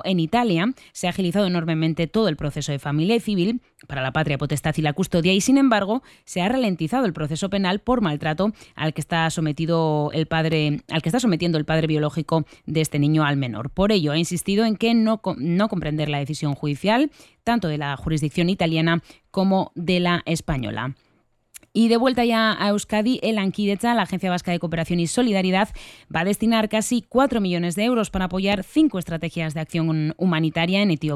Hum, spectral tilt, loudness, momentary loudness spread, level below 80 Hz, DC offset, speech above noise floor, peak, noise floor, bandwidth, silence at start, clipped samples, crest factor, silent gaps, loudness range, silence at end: none; -5.5 dB/octave; -22 LUFS; 7 LU; -46 dBFS; under 0.1%; 35 dB; -6 dBFS; -56 dBFS; 13.5 kHz; 0.05 s; under 0.1%; 16 dB; none; 2 LU; 0 s